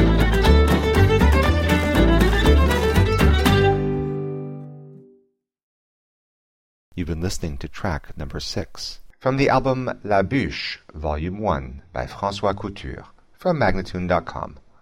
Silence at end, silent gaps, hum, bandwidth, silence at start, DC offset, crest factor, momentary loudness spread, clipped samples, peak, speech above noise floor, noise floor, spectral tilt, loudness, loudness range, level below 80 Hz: 0.25 s; 5.63-6.92 s; none; 16.5 kHz; 0 s; 0.2%; 18 dB; 16 LU; under 0.1%; -2 dBFS; 39 dB; -63 dBFS; -6.5 dB/octave; -20 LUFS; 15 LU; -26 dBFS